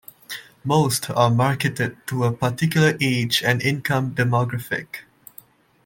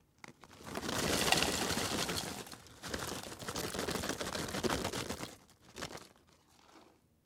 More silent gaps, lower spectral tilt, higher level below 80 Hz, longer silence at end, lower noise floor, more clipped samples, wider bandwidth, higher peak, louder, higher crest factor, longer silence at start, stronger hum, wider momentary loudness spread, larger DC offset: neither; first, -5 dB/octave vs -2.5 dB/octave; about the same, -58 dBFS vs -58 dBFS; first, 0.85 s vs 0.45 s; second, -49 dBFS vs -66 dBFS; neither; about the same, 17 kHz vs 17.5 kHz; first, -4 dBFS vs -10 dBFS; first, -21 LUFS vs -36 LUFS; second, 18 dB vs 28 dB; about the same, 0.3 s vs 0.25 s; neither; second, 13 LU vs 20 LU; neither